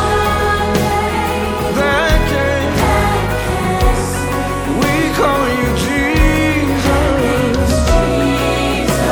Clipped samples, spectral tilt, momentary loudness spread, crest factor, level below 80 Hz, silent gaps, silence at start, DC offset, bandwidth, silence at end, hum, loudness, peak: under 0.1%; -5 dB/octave; 4 LU; 14 dB; -22 dBFS; none; 0 s; under 0.1%; over 20 kHz; 0 s; none; -15 LUFS; 0 dBFS